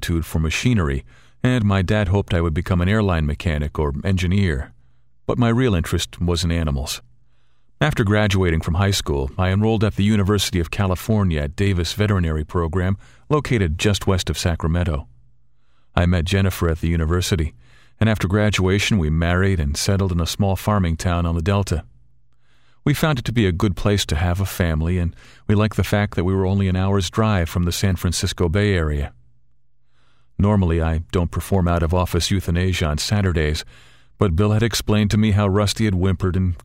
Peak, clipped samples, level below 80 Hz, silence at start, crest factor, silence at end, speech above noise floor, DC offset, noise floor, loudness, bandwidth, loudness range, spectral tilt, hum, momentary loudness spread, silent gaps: -2 dBFS; under 0.1%; -30 dBFS; 0 s; 18 dB; 0.05 s; 47 dB; 0.3%; -66 dBFS; -20 LUFS; 16 kHz; 3 LU; -6 dB/octave; none; 6 LU; none